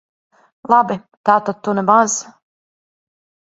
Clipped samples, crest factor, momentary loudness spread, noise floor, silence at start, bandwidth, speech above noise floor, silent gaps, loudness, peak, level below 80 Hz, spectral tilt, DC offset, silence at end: under 0.1%; 18 dB; 9 LU; under -90 dBFS; 0.65 s; 8.2 kHz; over 74 dB; 1.17-1.24 s; -16 LUFS; 0 dBFS; -64 dBFS; -4.5 dB/octave; under 0.1%; 1.3 s